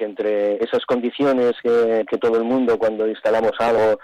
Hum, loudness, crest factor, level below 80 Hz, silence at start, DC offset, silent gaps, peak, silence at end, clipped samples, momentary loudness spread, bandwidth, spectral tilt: none; -19 LUFS; 8 dB; -58 dBFS; 0 s; under 0.1%; none; -12 dBFS; 0.05 s; under 0.1%; 4 LU; 9.6 kHz; -6 dB/octave